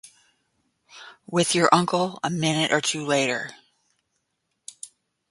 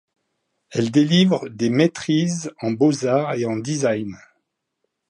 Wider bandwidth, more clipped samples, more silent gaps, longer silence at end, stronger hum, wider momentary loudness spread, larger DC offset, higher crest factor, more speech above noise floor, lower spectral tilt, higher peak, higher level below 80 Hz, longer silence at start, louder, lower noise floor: about the same, 11.5 kHz vs 11 kHz; neither; neither; second, 0.45 s vs 0.95 s; neither; first, 25 LU vs 10 LU; neither; first, 24 dB vs 18 dB; about the same, 54 dB vs 56 dB; second, -3.5 dB/octave vs -5.5 dB/octave; about the same, -2 dBFS vs -4 dBFS; about the same, -66 dBFS vs -64 dBFS; first, 0.95 s vs 0.7 s; about the same, -22 LUFS vs -20 LUFS; about the same, -77 dBFS vs -76 dBFS